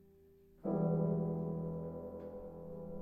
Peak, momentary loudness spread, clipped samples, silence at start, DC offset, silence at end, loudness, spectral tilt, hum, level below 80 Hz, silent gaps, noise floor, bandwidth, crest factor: -22 dBFS; 14 LU; under 0.1%; 0.55 s; under 0.1%; 0 s; -39 LUFS; -13 dB/octave; none; -62 dBFS; none; -64 dBFS; 2 kHz; 16 dB